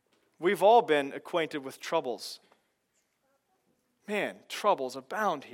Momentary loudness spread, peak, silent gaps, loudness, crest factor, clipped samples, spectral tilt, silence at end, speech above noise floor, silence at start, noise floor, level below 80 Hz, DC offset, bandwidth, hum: 15 LU; -10 dBFS; none; -29 LUFS; 20 dB; under 0.1%; -4 dB/octave; 0.05 s; 47 dB; 0.4 s; -76 dBFS; under -90 dBFS; under 0.1%; 17 kHz; none